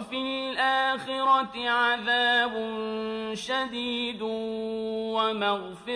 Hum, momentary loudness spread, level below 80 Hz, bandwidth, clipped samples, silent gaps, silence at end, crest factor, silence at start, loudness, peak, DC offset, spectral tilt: none; 8 LU; -66 dBFS; 11 kHz; under 0.1%; none; 0 s; 16 dB; 0 s; -27 LUFS; -12 dBFS; under 0.1%; -3.5 dB/octave